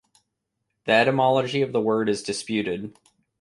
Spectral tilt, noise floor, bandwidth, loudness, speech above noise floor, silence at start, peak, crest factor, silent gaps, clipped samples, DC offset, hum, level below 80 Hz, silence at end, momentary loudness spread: -5 dB/octave; -79 dBFS; 11.5 kHz; -23 LUFS; 56 dB; 0.85 s; -6 dBFS; 18 dB; none; under 0.1%; under 0.1%; none; -64 dBFS; 0.5 s; 13 LU